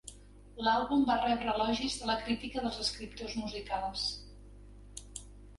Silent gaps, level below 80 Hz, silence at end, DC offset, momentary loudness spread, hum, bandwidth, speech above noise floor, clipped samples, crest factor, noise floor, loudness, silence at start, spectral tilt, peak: none; -52 dBFS; 0 s; under 0.1%; 19 LU; 50 Hz at -50 dBFS; 11.5 kHz; 20 dB; under 0.1%; 18 dB; -53 dBFS; -33 LUFS; 0.05 s; -3.5 dB/octave; -16 dBFS